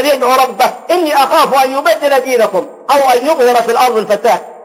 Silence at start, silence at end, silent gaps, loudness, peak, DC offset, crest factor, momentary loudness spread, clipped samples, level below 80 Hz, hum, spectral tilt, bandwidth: 0 s; 0 s; none; -11 LUFS; 0 dBFS; under 0.1%; 10 dB; 4 LU; under 0.1%; -60 dBFS; none; -2.5 dB/octave; 16.5 kHz